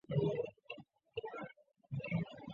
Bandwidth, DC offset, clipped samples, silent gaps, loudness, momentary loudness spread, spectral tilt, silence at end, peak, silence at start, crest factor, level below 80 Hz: 7 kHz; under 0.1%; under 0.1%; none; -42 LUFS; 15 LU; -6.5 dB/octave; 0 s; -24 dBFS; 0.1 s; 18 dB; -70 dBFS